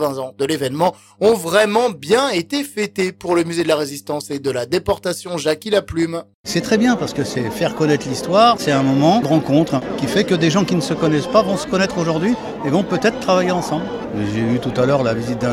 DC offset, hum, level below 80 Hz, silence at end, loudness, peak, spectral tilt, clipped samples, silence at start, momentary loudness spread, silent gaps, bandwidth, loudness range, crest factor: under 0.1%; none; -48 dBFS; 0 s; -18 LUFS; 0 dBFS; -5.5 dB/octave; under 0.1%; 0 s; 8 LU; 6.34-6.44 s; 17 kHz; 4 LU; 18 dB